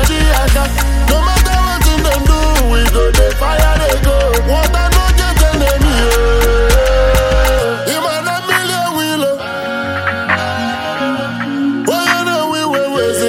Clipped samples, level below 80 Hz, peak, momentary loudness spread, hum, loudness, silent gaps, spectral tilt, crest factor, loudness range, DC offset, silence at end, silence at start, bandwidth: under 0.1%; -14 dBFS; 0 dBFS; 5 LU; none; -13 LUFS; none; -4.5 dB/octave; 12 dB; 4 LU; under 0.1%; 0 s; 0 s; 16.5 kHz